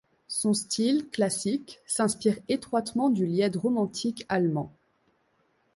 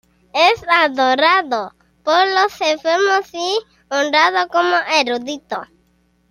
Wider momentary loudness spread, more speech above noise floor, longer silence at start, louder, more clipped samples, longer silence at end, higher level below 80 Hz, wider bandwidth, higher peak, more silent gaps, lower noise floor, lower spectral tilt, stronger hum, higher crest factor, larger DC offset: second, 7 LU vs 11 LU; about the same, 43 dB vs 43 dB; about the same, 0.3 s vs 0.35 s; second, -27 LUFS vs -16 LUFS; neither; first, 1.05 s vs 0.65 s; second, -68 dBFS vs -62 dBFS; second, 12 kHz vs 15.5 kHz; second, -12 dBFS vs 0 dBFS; neither; first, -70 dBFS vs -60 dBFS; first, -4.5 dB/octave vs -1.5 dB/octave; neither; about the same, 16 dB vs 16 dB; neither